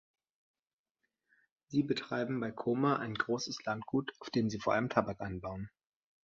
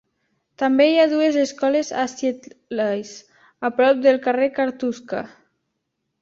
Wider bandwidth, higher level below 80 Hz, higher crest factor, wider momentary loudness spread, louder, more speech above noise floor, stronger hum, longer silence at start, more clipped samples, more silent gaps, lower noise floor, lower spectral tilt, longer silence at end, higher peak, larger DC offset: about the same, 7.6 kHz vs 7.8 kHz; about the same, -64 dBFS vs -68 dBFS; first, 24 dB vs 16 dB; second, 9 LU vs 14 LU; second, -35 LUFS vs -20 LUFS; second, 52 dB vs 57 dB; neither; first, 1.7 s vs 0.6 s; neither; neither; first, -86 dBFS vs -76 dBFS; first, -6 dB/octave vs -4 dB/octave; second, 0.6 s vs 0.95 s; second, -14 dBFS vs -4 dBFS; neither